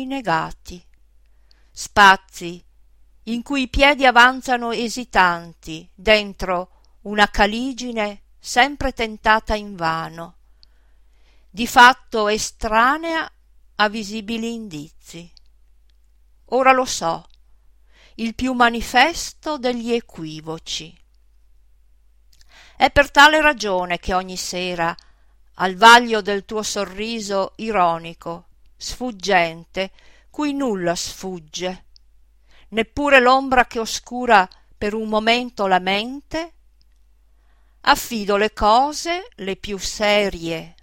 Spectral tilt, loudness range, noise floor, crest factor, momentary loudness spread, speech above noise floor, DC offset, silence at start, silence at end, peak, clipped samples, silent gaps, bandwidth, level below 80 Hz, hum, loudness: -3 dB/octave; 7 LU; -55 dBFS; 20 dB; 20 LU; 36 dB; 0.1%; 0 s; 0.15 s; 0 dBFS; under 0.1%; none; 16.5 kHz; -40 dBFS; none; -18 LUFS